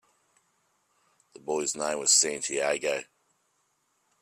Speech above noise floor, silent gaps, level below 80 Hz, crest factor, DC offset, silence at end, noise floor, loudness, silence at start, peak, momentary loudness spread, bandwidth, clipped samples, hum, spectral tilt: 46 dB; none; -76 dBFS; 22 dB; under 0.1%; 1.2 s; -73 dBFS; -26 LUFS; 1.45 s; -8 dBFS; 13 LU; 15 kHz; under 0.1%; none; 0 dB/octave